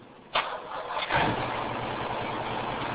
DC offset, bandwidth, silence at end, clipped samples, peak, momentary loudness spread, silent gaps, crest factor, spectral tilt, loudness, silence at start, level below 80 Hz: under 0.1%; 4 kHz; 0 s; under 0.1%; -14 dBFS; 7 LU; none; 18 dB; -2.5 dB/octave; -30 LUFS; 0 s; -52 dBFS